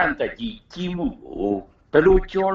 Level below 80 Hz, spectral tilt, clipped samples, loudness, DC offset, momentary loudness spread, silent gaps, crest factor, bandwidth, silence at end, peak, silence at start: -34 dBFS; -7.5 dB/octave; under 0.1%; -22 LUFS; under 0.1%; 14 LU; none; 18 dB; 7 kHz; 0 s; -4 dBFS; 0 s